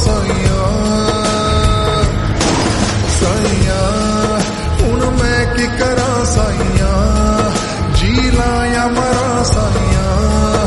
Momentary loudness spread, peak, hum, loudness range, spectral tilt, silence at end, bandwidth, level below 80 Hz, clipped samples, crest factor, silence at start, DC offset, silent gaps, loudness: 2 LU; 0 dBFS; none; 1 LU; -5 dB/octave; 0 s; 11.5 kHz; -20 dBFS; under 0.1%; 12 dB; 0 s; under 0.1%; none; -14 LUFS